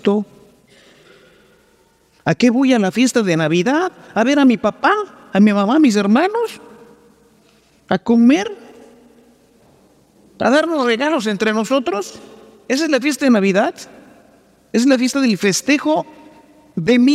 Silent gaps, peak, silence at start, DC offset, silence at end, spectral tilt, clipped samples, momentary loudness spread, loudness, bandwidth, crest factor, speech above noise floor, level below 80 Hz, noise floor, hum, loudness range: none; -2 dBFS; 0.05 s; under 0.1%; 0 s; -5 dB/octave; under 0.1%; 10 LU; -16 LUFS; 14.5 kHz; 16 dB; 40 dB; -62 dBFS; -55 dBFS; none; 5 LU